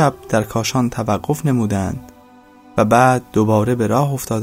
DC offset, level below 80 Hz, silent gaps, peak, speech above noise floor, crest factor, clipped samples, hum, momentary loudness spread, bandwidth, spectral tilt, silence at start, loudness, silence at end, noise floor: under 0.1%; -44 dBFS; none; 0 dBFS; 29 dB; 16 dB; under 0.1%; none; 8 LU; 16 kHz; -6 dB/octave; 0 s; -17 LUFS; 0 s; -45 dBFS